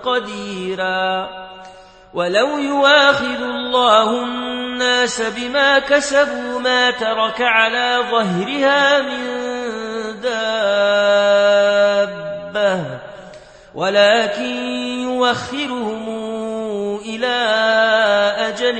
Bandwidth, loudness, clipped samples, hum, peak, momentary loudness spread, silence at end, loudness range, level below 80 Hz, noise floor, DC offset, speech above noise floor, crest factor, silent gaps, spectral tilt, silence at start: 8.8 kHz; -16 LUFS; under 0.1%; none; 0 dBFS; 12 LU; 0 s; 3 LU; -54 dBFS; -41 dBFS; under 0.1%; 25 dB; 18 dB; none; -3 dB/octave; 0 s